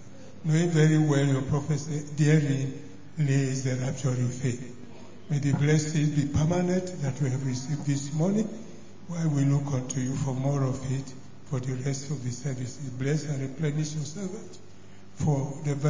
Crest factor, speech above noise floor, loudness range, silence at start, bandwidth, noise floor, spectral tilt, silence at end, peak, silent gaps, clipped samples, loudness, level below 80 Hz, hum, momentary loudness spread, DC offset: 18 dB; 24 dB; 6 LU; 0 s; 7.6 kHz; -51 dBFS; -6.5 dB/octave; 0 s; -10 dBFS; none; under 0.1%; -28 LUFS; -54 dBFS; none; 14 LU; 0.8%